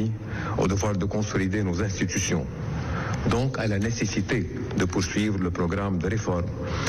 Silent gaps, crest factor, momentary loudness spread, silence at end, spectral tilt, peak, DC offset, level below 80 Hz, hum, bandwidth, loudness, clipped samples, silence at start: none; 10 dB; 5 LU; 0 s; -5.5 dB/octave; -14 dBFS; under 0.1%; -40 dBFS; none; 13 kHz; -26 LUFS; under 0.1%; 0 s